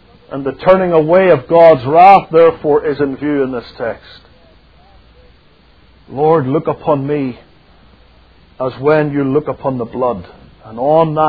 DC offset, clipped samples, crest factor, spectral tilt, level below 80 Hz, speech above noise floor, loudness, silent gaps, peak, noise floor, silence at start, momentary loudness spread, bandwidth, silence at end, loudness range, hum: 0.2%; 0.4%; 14 dB; -10 dB/octave; -46 dBFS; 36 dB; -12 LUFS; none; 0 dBFS; -47 dBFS; 0.3 s; 16 LU; 5.4 kHz; 0 s; 10 LU; none